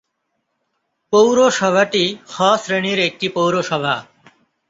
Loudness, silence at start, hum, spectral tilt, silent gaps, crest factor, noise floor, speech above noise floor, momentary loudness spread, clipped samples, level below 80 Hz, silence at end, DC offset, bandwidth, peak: -16 LUFS; 1.1 s; none; -4 dB/octave; none; 16 dB; -72 dBFS; 56 dB; 7 LU; under 0.1%; -62 dBFS; 0.65 s; under 0.1%; 8 kHz; -2 dBFS